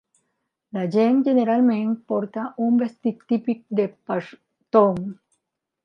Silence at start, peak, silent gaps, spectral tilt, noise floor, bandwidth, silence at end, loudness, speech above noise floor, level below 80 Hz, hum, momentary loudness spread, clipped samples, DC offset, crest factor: 0.75 s; -4 dBFS; none; -9 dB/octave; -78 dBFS; 6 kHz; 0.7 s; -22 LUFS; 57 dB; -68 dBFS; none; 11 LU; under 0.1%; under 0.1%; 18 dB